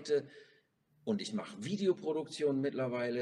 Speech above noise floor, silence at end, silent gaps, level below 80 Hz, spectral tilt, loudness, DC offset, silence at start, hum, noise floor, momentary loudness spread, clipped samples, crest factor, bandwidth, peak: 37 dB; 0 s; none; -82 dBFS; -6 dB/octave; -36 LUFS; under 0.1%; 0 s; none; -72 dBFS; 7 LU; under 0.1%; 16 dB; 11 kHz; -20 dBFS